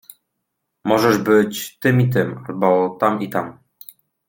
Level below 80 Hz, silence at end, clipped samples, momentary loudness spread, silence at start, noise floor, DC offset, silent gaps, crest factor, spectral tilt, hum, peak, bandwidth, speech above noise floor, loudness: -60 dBFS; 0.75 s; under 0.1%; 10 LU; 0.85 s; -76 dBFS; under 0.1%; none; 18 dB; -6.5 dB/octave; none; -2 dBFS; 17 kHz; 59 dB; -18 LUFS